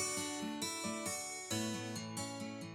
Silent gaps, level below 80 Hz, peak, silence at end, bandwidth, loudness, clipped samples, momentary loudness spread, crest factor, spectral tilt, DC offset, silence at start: none; -76 dBFS; -26 dBFS; 0 s; 18 kHz; -40 LUFS; under 0.1%; 4 LU; 16 dB; -3 dB/octave; under 0.1%; 0 s